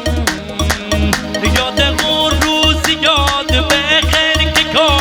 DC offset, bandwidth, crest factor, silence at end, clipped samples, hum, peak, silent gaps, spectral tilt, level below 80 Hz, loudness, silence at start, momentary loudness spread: under 0.1%; 18.5 kHz; 14 dB; 0 s; under 0.1%; none; 0 dBFS; none; -3.5 dB/octave; -22 dBFS; -12 LUFS; 0 s; 6 LU